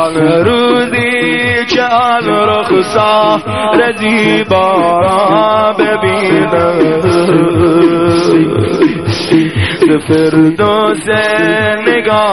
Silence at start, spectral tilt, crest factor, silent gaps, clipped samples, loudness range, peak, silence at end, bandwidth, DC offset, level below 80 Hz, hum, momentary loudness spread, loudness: 0 s; -6 dB/octave; 10 dB; none; under 0.1%; 1 LU; 0 dBFS; 0 s; 12 kHz; 0.7%; -44 dBFS; none; 2 LU; -10 LUFS